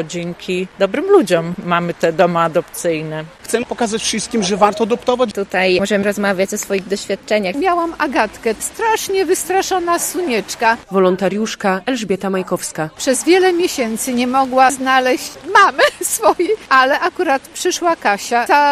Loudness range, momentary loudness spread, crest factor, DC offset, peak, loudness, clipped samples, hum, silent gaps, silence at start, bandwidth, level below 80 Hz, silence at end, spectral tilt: 4 LU; 8 LU; 16 dB; under 0.1%; 0 dBFS; -16 LUFS; under 0.1%; none; none; 0 s; 15.5 kHz; -52 dBFS; 0 s; -3.5 dB/octave